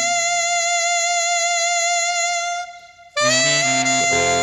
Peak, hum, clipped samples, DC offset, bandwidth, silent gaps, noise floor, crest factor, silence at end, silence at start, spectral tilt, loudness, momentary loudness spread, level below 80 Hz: -6 dBFS; none; under 0.1%; under 0.1%; 13.5 kHz; none; -41 dBFS; 12 dB; 0 s; 0 s; -0.5 dB/octave; -17 LUFS; 7 LU; -58 dBFS